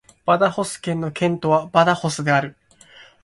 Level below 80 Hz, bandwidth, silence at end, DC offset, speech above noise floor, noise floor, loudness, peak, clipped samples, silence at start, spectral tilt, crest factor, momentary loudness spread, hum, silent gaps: -58 dBFS; 11.5 kHz; 0.7 s; under 0.1%; 29 dB; -48 dBFS; -20 LUFS; 0 dBFS; under 0.1%; 0.25 s; -5.5 dB/octave; 20 dB; 8 LU; none; none